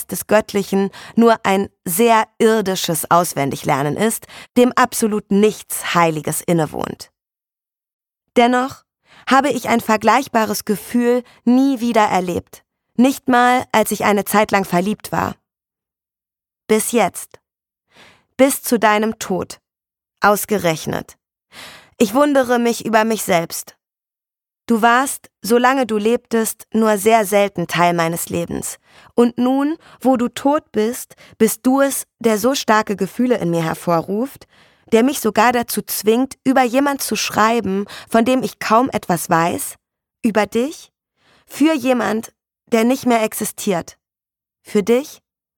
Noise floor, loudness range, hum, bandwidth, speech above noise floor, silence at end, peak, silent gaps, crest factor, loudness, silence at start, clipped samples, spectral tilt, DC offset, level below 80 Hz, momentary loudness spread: -90 dBFS; 4 LU; none; 19 kHz; 73 dB; 0.45 s; -2 dBFS; 7.93-7.99 s; 16 dB; -17 LUFS; 0 s; under 0.1%; -4.5 dB/octave; under 0.1%; -56 dBFS; 10 LU